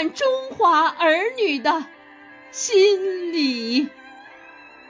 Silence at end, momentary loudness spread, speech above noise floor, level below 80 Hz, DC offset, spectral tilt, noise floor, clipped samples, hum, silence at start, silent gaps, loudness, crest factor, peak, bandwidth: 0.2 s; 10 LU; 25 dB; -72 dBFS; under 0.1%; -1.5 dB/octave; -45 dBFS; under 0.1%; none; 0 s; none; -20 LUFS; 16 dB; -6 dBFS; 7.6 kHz